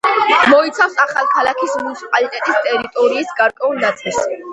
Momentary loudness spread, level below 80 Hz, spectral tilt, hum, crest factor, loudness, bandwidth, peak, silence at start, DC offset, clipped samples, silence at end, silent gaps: 8 LU; -60 dBFS; -2.5 dB/octave; none; 16 dB; -15 LUFS; 10.5 kHz; 0 dBFS; 0.05 s; under 0.1%; under 0.1%; 0 s; none